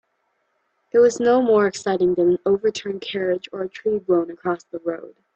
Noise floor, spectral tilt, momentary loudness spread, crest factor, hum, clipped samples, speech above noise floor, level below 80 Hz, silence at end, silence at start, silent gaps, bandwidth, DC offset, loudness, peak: -70 dBFS; -5.5 dB/octave; 12 LU; 16 dB; none; under 0.1%; 50 dB; -62 dBFS; 0.25 s; 0.95 s; none; 8.6 kHz; under 0.1%; -21 LUFS; -6 dBFS